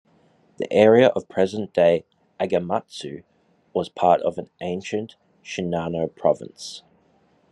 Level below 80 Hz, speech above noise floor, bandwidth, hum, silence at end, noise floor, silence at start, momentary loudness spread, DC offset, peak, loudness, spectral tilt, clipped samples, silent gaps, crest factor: -66 dBFS; 39 dB; 11 kHz; none; 0.75 s; -61 dBFS; 0.6 s; 18 LU; under 0.1%; -2 dBFS; -22 LUFS; -6 dB/octave; under 0.1%; none; 20 dB